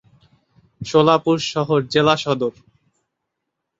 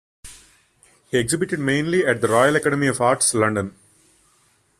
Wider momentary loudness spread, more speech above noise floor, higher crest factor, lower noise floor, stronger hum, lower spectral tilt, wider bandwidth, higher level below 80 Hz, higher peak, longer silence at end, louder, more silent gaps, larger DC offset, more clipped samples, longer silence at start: about the same, 8 LU vs 7 LU; first, 61 dB vs 42 dB; about the same, 18 dB vs 20 dB; first, -79 dBFS vs -61 dBFS; neither; first, -5.5 dB/octave vs -4 dB/octave; second, 8 kHz vs 14.5 kHz; about the same, -58 dBFS vs -56 dBFS; about the same, -2 dBFS vs -2 dBFS; first, 1.3 s vs 1.1 s; about the same, -18 LUFS vs -19 LUFS; neither; neither; neither; first, 0.8 s vs 0.25 s